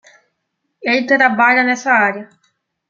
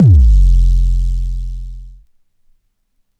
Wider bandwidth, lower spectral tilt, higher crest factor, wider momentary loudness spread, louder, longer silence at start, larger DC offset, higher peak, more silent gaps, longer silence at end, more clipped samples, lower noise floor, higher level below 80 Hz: first, 7.6 kHz vs 0.8 kHz; second, -4 dB/octave vs -9.5 dB/octave; first, 16 dB vs 10 dB; second, 10 LU vs 19 LU; about the same, -13 LUFS vs -14 LUFS; first, 0.8 s vs 0 s; neither; about the same, -2 dBFS vs -2 dBFS; neither; second, 0.65 s vs 1.3 s; neither; first, -72 dBFS vs -62 dBFS; second, -70 dBFS vs -14 dBFS